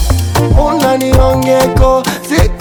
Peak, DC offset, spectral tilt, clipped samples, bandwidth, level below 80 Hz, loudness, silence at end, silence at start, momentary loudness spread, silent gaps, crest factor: 0 dBFS; under 0.1%; -6 dB/octave; 0.3%; over 20 kHz; -16 dBFS; -11 LUFS; 0 s; 0 s; 3 LU; none; 10 dB